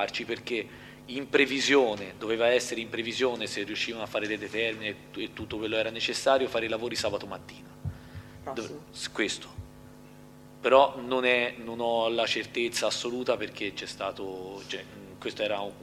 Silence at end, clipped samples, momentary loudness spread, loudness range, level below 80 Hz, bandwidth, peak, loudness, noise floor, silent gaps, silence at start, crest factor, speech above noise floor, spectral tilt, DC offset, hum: 0 s; under 0.1%; 16 LU; 7 LU; -60 dBFS; 15.5 kHz; -6 dBFS; -29 LUFS; -50 dBFS; none; 0 s; 24 dB; 21 dB; -3 dB/octave; under 0.1%; none